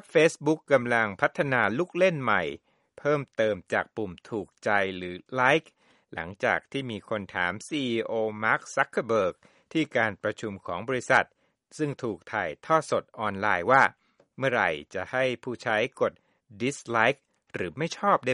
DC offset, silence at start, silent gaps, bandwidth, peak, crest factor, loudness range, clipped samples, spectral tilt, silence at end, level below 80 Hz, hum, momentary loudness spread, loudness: under 0.1%; 0.15 s; none; 11.5 kHz; -4 dBFS; 22 dB; 3 LU; under 0.1%; -5 dB/octave; 0 s; -66 dBFS; none; 12 LU; -27 LUFS